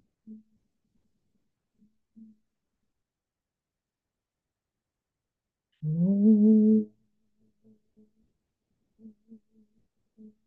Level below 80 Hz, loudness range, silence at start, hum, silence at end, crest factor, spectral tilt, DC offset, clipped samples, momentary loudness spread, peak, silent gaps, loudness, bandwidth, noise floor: -82 dBFS; 9 LU; 0.3 s; none; 3.6 s; 18 dB; -15.5 dB/octave; under 0.1%; under 0.1%; 17 LU; -12 dBFS; none; -23 LUFS; 0.9 kHz; -90 dBFS